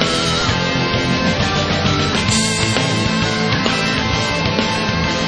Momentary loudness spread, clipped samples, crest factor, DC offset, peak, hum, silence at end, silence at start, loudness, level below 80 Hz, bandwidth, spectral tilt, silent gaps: 2 LU; under 0.1%; 16 dB; under 0.1%; 0 dBFS; none; 0 s; 0 s; -16 LUFS; -34 dBFS; 10.5 kHz; -4 dB/octave; none